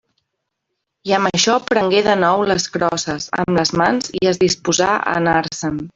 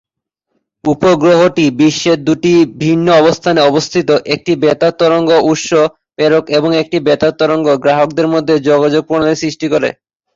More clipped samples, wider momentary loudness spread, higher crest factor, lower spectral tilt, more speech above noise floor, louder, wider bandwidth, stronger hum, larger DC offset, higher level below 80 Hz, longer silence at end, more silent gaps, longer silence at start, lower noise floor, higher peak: neither; about the same, 7 LU vs 5 LU; first, 18 dB vs 10 dB; second, -3.5 dB/octave vs -5.5 dB/octave; second, 59 dB vs 63 dB; second, -17 LUFS vs -11 LUFS; about the same, 8 kHz vs 7.8 kHz; neither; neither; about the same, -50 dBFS vs -50 dBFS; second, 0.05 s vs 0.45 s; neither; first, 1.05 s vs 0.85 s; about the same, -76 dBFS vs -74 dBFS; about the same, 0 dBFS vs 0 dBFS